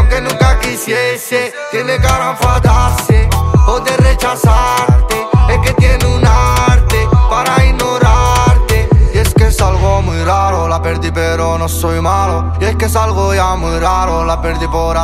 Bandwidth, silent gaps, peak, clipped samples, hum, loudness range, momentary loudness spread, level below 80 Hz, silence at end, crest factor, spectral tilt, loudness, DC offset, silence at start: 16 kHz; none; 0 dBFS; under 0.1%; none; 3 LU; 5 LU; -14 dBFS; 0 s; 10 dB; -5.5 dB/octave; -12 LUFS; under 0.1%; 0 s